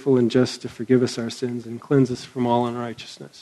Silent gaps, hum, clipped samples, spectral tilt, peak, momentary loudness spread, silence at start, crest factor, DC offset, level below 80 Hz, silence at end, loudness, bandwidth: none; none; under 0.1%; -6.5 dB/octave; -4 dBFS; 13 LU; 0 s; 18 dB; under 0.1%; -62 dBFS; 0 s; -23 LUFS; 12 kHz